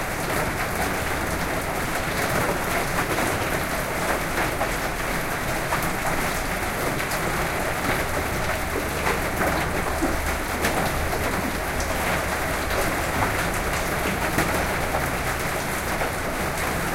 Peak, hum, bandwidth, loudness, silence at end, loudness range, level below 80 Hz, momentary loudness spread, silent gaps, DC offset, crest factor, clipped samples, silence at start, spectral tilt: -6 dBFS; none; 17 kHz; -24 LUFS; 0 s; 1 LU; -34 dBFS; 3 LU; none; under 0.1%; 18 dB; under 0.1%; 0 s; -4 dB/octave